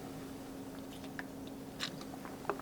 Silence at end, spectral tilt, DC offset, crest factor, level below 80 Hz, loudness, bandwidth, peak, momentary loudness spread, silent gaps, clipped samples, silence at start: 0 s; -4 dB/octave; under 0.1%; 28 dB; -64 dBFS; -45 LUFS; over 20 kHz; -18 dBFS; 5 LU; none; under 0.1%; 0 s